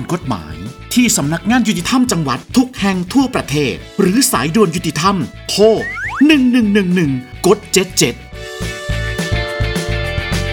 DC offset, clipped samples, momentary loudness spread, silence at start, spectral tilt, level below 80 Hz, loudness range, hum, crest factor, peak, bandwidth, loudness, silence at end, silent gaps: under 0.1%; under 0.1%; 9 LU; 0 s; -4.5 dB/octave; -32 dBFS; 3 LU; none; 14 dB; 0 dBFS; over 20 kHz; -15 LUFS; 0 s; none